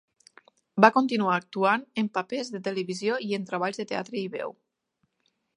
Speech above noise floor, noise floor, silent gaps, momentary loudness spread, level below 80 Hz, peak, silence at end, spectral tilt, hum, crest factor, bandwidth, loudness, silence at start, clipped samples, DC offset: 50 dB; -76 dBFS; none; 13 LU; -78 dBFS; 0 dBFS; 1.05 s; -5.5 dB/octave; none; 28 dB; 10.5 kHz; -27 LUFS; 0.75 s; under 0.1%; under 0.1%